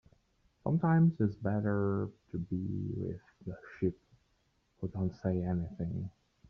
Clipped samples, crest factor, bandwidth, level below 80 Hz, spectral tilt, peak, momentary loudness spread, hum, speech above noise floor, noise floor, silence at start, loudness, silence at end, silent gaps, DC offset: under 0.1%; 16 dB; 4.9 kHz; -60 dBFS; -10.5 dB/octave; -18 dBFS; 15 LU; none; 42 dB; -74 dBFS; 0.65 s; -34 LUFS; 0.4 s; none; under 0.1%